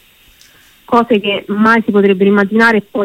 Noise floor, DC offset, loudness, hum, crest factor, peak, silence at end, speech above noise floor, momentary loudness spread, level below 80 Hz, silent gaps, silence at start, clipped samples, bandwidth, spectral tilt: -46 dBFS; under 0.1%; -11 LUFS; none; 12 dB; 0 dBFS; 0 s; 35 dB; 4 LU; -54 dBFS; none; 0.9 s; under 0.1%; 15 kHz; -6.5 dB/octave